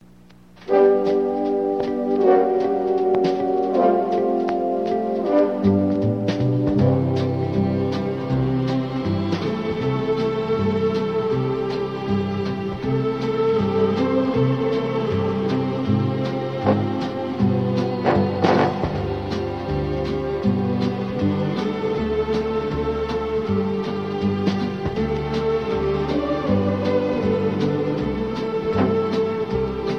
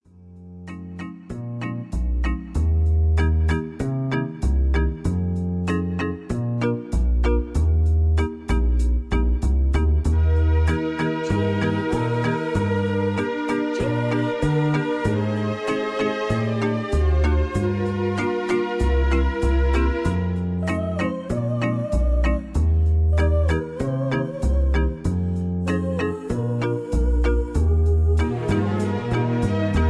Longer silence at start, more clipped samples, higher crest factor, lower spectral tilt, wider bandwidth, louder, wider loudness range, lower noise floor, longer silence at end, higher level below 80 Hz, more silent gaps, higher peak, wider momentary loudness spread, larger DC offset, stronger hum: first, 0.6 s vs 0.25 s; neither; first, 18 dB vs 12 dB; about the same, -8.5 dB/octave vs -8 dB/octave; second, 7.8 kHz vs 11 kHz; about the same, -21 LUFS vs -22 LUFS; about the same, 3 LU vs 2 LU; first, -48 dBFS vs -44 dBFS; about the same, 0 s vs 0 s; second, -42 dBFS vs -24 dBFS; neither; first, -2 dBFS vs -8 dBFS; about the same, 6 LU vs 6 LU; first, 0.2% vs under 0.1%; neither